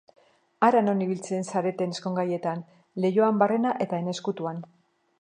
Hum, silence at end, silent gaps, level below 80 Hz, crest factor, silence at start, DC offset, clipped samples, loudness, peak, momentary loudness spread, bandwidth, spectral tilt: none; 0.55 s; none; -78 dBFS; 22 dB; 0.6 s; under 0.1%; under 0.1%; -26 LUFS; -4 dBFS; 11 LU; 10 kHz; -6.5 dB/octave